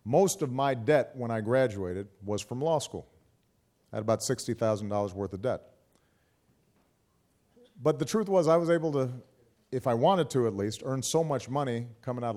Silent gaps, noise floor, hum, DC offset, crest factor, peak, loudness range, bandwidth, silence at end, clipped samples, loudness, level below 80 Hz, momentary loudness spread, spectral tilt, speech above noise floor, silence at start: none; -71 dBFS; none; under 0.1%; 18 dB; -12 dBFS; 7 LU; 15.5 kHz; 0 s; under 0.1%; -29 LUFS; -68 dBFS; 11 LU; -5.5 dB/octave; 42 dB; 0.05 s